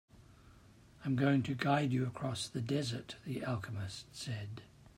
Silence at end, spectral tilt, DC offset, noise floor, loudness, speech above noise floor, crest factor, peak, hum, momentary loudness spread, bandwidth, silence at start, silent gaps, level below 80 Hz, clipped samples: 0.1 s; -6 dB/octave; under 0.1%; -61 dBFS; -37 LUFS; 25 dB; 20 dB; -18 dBFS; none; 13 LU; 15.5 kHz; 0.2 s; none; -66 dBFS; under 0.1%